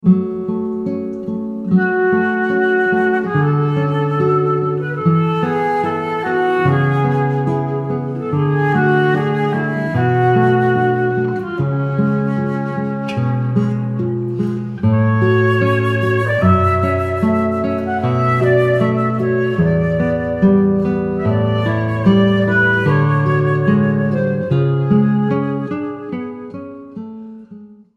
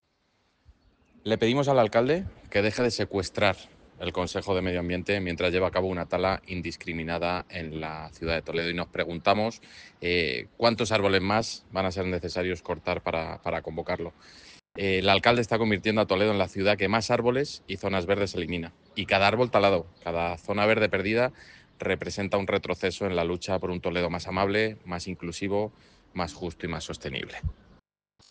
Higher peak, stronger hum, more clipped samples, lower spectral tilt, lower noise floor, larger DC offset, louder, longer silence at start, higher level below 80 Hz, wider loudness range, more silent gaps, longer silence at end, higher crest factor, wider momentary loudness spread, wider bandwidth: about the same, -2 dBFS vs -4 dBFS; neither; neither; first, -9 dB/octave vs -5 dB/octave; second, -39 dBFS vs -71 dBFS; neither; first, -16 LUFS vs -27 LUFS; second, 0.05 s vs 1.25 s; first, -46 dBFS vs -52 dBFS; about the same, 3 LU vs 5 LU; neither; second, 0.25 s vs 0.8 s; second, 14 dB vs 24 dB; second, 8 LU vs 12 LU; second, 7 kHz vs 9.6 kHz